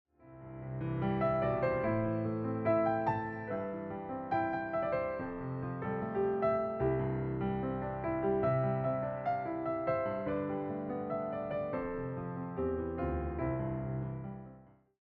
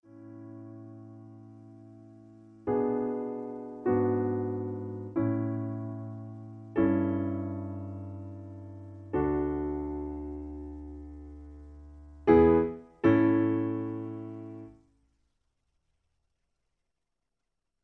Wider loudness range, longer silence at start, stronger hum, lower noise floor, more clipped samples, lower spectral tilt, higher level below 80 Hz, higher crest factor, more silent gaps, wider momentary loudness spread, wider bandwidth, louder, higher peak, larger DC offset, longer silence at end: second, 4 LU vs 9 LU; about the same, 0.2 s vs 0.15 s; neither; second, -58 dBFS vs -86 dBFS; neither; about the same, -11 dB/octave vs -10.5 dB/octave; about the same, -54 dBFS vs -52 dBFS; second, 14 dB vs 24 dB; neither; second, 9 LU vs 25 LU; about the same, 4.6 kHz vs 4.2 kHz; second, -35 LUFS vs -30 LUFS; second, -20 dBFS vs -8 dBFS; neither; second, 0.35 s vs 3.1 s